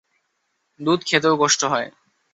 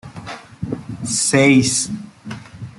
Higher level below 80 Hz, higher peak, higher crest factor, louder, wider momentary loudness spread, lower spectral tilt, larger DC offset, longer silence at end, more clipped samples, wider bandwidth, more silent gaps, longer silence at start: second, -66 dBFS vs -52 dBFS; about the same, -4 dBFS vs -2 dBFS; about the same, 20 dB vs 18 dB; second, -19 LUFS vs -16 LUFS; second, 10 LU vs 21 LU; about the same, -3 dB/octave vs -4 dB/octave; neither; first, 0.45 s vs 0.05 s; neither; second, 8.2 kHz vs 12.5 kHz; neither; first, 0.8 s vs 0.05 s